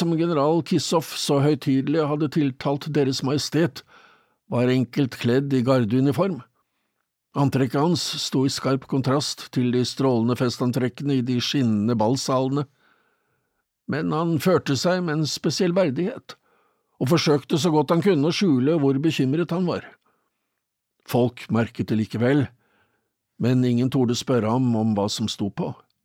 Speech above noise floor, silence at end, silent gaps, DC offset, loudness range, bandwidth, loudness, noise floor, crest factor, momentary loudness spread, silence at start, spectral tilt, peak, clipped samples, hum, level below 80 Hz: 58 dB; 0.3 s; none; under 0.1%; 3 LU; 16.5 kHz; -22 LUFS; -80 dBFS; 16 dB; 7 LU; 0 s; -6 dB/octave; -8 dBFS; under 0.1%; none; -64 dBFS